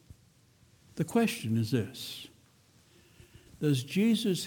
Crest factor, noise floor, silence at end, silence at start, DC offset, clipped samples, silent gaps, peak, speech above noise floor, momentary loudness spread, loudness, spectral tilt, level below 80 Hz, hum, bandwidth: 18 dB; -63 dBFS; 0 s; 0.95 s; under 0.1%; under 0.1%; none; -16 dBFS; 34 dB; 16 LU; -30 LUFS; -5.5 dB/octave; -66 dBFS; none; 20 kHz